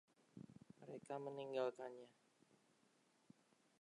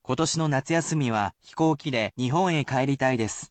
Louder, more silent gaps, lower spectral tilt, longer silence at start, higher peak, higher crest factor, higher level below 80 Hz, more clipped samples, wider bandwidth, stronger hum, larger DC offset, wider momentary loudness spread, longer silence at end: second, -49 LUFS vs -25 LUFS; neither; about the same, -6 dB/octave vs -5 dB/octave; first, 0.35 s vs 0.1 s; second, -30 dBFS vs -10 dBFS; first, 22 dB vs 14 dB; second, under -90 dBFS vs -60 dBFS; neither; first, 11 kHz vs 9.2 kHz; neither; neither; first, 18 LU vs 4 LU; first, 1.7 s vs 0.05 s